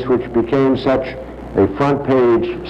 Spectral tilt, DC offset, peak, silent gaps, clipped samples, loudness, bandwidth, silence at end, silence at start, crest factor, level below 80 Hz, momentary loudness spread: -8.5 dB/octave; under 0.1%; -2 dBFS; none; under 0.1%; -16 LUFS; 7.2 kHz; 0 s; 0 s; 14 dB; -38 dBFS; 8 LU